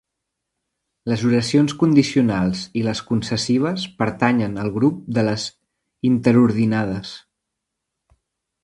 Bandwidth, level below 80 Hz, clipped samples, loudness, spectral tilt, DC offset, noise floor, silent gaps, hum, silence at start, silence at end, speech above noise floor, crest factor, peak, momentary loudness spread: 11.5 kHz; -52 dBFS; under 0.1%; -19 LUFS; -6 dB/octave; under 0.1%; -80 dBFS; none; none; 1.05 s; 1.45 s; 61 dB; 20 dB; 0 dBFS; 10 LU